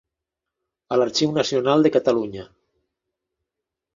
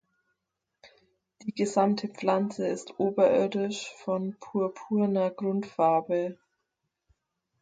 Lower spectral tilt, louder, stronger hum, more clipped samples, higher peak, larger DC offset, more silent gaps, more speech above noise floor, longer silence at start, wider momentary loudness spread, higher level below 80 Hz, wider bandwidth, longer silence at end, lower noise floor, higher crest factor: about the same, -5 dB/octave vs -6 dB/octave; first, -20 LUFS vs -28 LUFS; neither; neither; first, -4 dBFS vs -10 dBFS; neither; neither; first, 65 dB vs 57 dB; about the same, 0.9 s vs 0.85 s; about the same, 10 LU vs 9 LU; first, -62 dBFS vs -76 dBFS; second, 7.6 kHz vs 9.2 kHz; first, 1.5 s vs 1.3 s; about the same, -85 dBFS vs -84 dBFS; about the same, 20 dB vs 20 dB